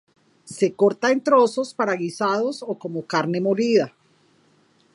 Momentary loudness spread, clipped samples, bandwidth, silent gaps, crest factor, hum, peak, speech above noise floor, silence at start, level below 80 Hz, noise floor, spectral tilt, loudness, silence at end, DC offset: 12 LU; under 0.1%; 11.5 kHz; none; 18 dB; none; -4 dBFS; 39 dB; 0.45 s; -76 dBFS; -60 dBFS; -5.5 dB/octave; -21 LUFS; 1.05 s; under 0.1%